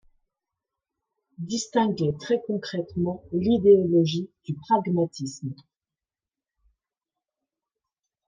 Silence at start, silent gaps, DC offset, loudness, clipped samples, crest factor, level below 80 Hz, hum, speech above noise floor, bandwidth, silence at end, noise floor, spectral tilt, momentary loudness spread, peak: 1.4 s; none; under 0.1%; -24 LUFS; under 0.1%; 20 dB; -64 dBFS; none; over 66 dB; 9.6 kHz; 2.75 s; under -90 dBFS; -6.5 dB/octave; 16 LU; -6 dBFS